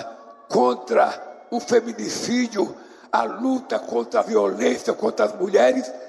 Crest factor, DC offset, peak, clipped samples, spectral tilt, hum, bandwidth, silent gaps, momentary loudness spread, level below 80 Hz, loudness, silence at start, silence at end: 16 dB; under 0.1%; -6 dBFS; under 0.1%; -4 dB/octave; none; 12.5 kHz; none; 8 LU; -72 dBFS; -22 LUFS; 0 s; 0 s